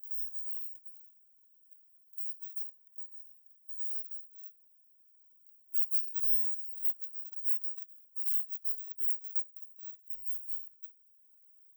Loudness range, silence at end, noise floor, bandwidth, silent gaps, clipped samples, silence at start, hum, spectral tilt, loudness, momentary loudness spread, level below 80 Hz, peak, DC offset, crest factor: 10 LU; 0.85 s; -64 dBFS; over 20 kHz; none; under 0.1%; 0 s; none; 0 dB/octave; -32 LUFS; 20 LU; under -90 dBFS; -14 dBFS; under 0.1%; 22 dB